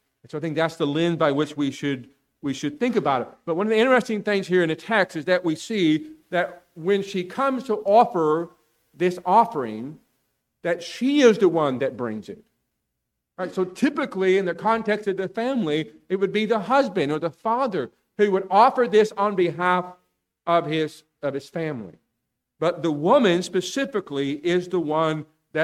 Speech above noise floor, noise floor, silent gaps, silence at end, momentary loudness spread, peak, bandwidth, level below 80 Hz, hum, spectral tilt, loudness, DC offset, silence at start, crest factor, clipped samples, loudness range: 58 dB; -80 dBFS; none; 0 s; 13 LU; -4 dBFS; 13.5 kHz; -68 dBFS; none; -5.5 dB/octave; -23 LUFS; under 0.1%; 0.35 s; 20 dB; under 0.1%; 4 LU